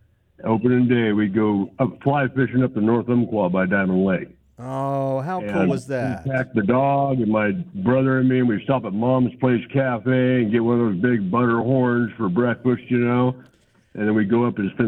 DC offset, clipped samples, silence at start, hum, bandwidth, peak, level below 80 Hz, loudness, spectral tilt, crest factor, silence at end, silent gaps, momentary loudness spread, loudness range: under 0.1%; under 0.1%; 0.45 s; none; 8.8 kHz; -6 dBFS; -56 dBFS; -20 LUFS; -9 dB/octave; 14 dB; 0 s; none; 6 LU; 2 LU